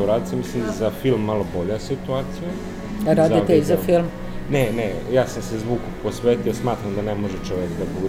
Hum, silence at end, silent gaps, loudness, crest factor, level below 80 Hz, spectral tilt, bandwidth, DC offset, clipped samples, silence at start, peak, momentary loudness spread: none; 0 s; none; -22 LUFS; 16 dB; -38 dBFS; -6.5 dB/octave; 16 kHz; under 0.1%; under 0.1%; 0 s; -4 dBFS; 10 LU